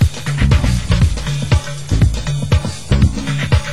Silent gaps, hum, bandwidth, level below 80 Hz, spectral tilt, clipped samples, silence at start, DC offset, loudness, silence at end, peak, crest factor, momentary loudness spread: none; none; 13 kHz; -18 dBFS; -6 dB/octave; under 0.1%; 0 s; 3%; -16 LUFS; 0 s; -2 dBFS; 12 dB; 5 LU